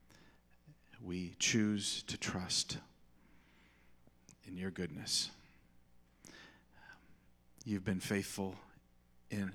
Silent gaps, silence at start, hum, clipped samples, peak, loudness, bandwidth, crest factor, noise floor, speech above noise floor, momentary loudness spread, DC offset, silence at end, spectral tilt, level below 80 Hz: none; 0.1 s; 60 Hz at -65 dBFS; under 0.1%; -20 dBFS; -38 LUFS; 19 kHz; 22 dB; -67 dBFS; 28 dB; 24 LU; under 0.1%; 0 s; -3 dB/octave; -70 dBFS